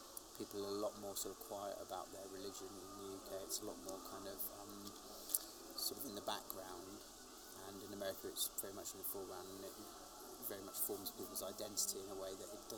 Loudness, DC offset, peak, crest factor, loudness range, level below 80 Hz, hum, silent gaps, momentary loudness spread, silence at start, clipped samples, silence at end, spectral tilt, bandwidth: -47 LUFS; under 0.1%; -14 dBFS; 34 dB; 3 LU; -72 dBFS; none; none; 11 LU; 0 s; under 0.1%; 0 s; -2 dB/octave; over 20 kHz